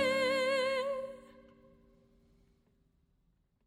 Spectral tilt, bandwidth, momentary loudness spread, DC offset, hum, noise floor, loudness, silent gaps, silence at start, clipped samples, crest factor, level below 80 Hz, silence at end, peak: -3 dB/octave; 15.5 kHz; 16 LU; under 0.1%; none; -74 dBFS; -32 LUFS; none; 0 s; under 0.1%; 18 dB; -70 dBFS; 2.4 s; -20 dBFS